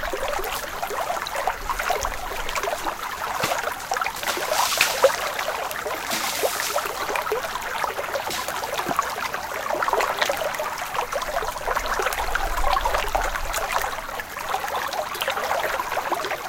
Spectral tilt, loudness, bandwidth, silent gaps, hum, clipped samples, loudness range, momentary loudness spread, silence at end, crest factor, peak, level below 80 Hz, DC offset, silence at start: -1.5 dB/octave; -25 LUFS; 17 kHz; none; none; under 0.1%; 3 LU; 6 LU; 0 s; 26 dB; 0 dBFS; -38 dBFS; under 0.1%; 0 s